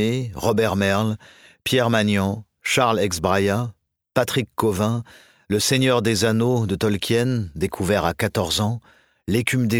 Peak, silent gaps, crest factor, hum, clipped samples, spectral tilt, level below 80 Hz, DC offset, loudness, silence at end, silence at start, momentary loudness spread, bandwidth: -2 dBFS; none; 18 dB; none; under 0.1%; -5 dB/octave; -48 dBFS; under 0.1%; -21 LUFS; 0 s; 0 s; 8 LU; 18 kHz